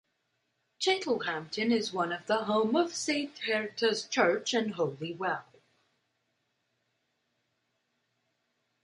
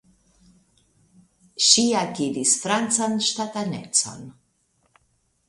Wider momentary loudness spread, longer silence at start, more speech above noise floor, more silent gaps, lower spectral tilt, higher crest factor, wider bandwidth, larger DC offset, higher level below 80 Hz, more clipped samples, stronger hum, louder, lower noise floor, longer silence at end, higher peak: second, 6 LU vs 14 LU; second, 0.8 s vs 1.55 s; first, 49 dB vs 45 dB; neither; first, -3.5 dB/octave vs -2 dB/octave; about the same, 22 dB vs 24 dB; about the same, 11.5 kHz vs 12 kHz; neither; second, -80 dBFS vs -66 dBFS; neither; neither; second, -30 LUFS vs -20 LUFS; first, -79 dBFS vs -68 dBFS; first, 3.4 s vs 1.2 s; second, -10 dBFS vs 0 dBFS